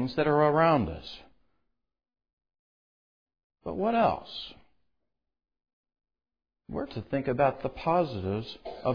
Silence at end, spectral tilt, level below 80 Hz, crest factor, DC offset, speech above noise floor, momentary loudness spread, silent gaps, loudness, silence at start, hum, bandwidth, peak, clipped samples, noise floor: 0 s; -8.5 dB/octave; -56 dBFS; 20 dB; under 0.1%; 61 dB; 18 LU; 2.33-2.37 s, 2.59-3.27 s, 3.44-3.50 s, 5.73-5.84 s; -28 LUFS; 0 s; none; 5.2 kHz; -12 dBFS; under 0.1%; -88 dBFS